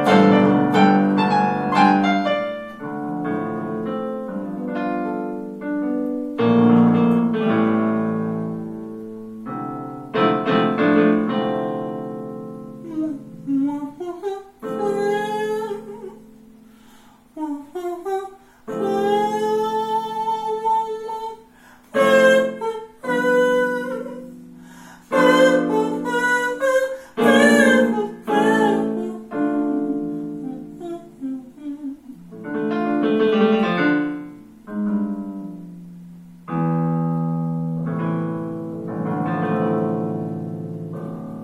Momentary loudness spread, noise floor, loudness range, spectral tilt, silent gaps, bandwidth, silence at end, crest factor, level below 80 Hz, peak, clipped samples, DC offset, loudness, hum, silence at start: 17 LU; -49 dBFS; 9 LU; -6.5 dB/octave; none; 14 kHz; 0 s; 20 dB; -62 dBFS; -2 dBFS; under 0.1%; under 0.1%; -20 LUFS; none; 0 s